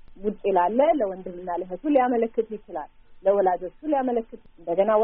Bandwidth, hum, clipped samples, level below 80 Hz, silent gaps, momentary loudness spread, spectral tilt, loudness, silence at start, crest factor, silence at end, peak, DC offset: 3.7 kHz; none; under 0.1%; -54 dBFS; none; 14 LU; -2 dB/octave; -24 LUFS; 0.1 s; 16 dB; 0 s; -8 dBFS; under 0.1%